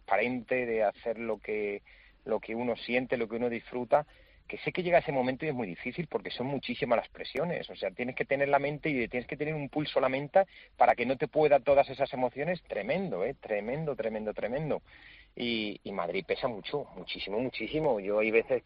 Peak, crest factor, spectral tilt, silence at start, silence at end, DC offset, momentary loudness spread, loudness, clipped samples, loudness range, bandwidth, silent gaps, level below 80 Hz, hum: -10 dBFS; 20 dB; -4 dB/octave; 0.1 s; 0.05 s; under 0.1%; 10 LU; -31 LUFS; under 0.1%; 6 LU; 5.4 kHz; none; -62 dBFS; none